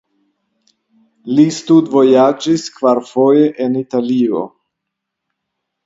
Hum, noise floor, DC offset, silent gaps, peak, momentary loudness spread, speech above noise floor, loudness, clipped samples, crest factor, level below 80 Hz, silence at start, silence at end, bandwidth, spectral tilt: none; -78 dBFS; under 0.1%; none; 0 dBFS; 8 LU; 65 dB; -13 LUFS; under 0.1%; 14 dB; -64 dBFS; 1.25 s; 1.4 s; 8 kHz; -6.5 dB/octave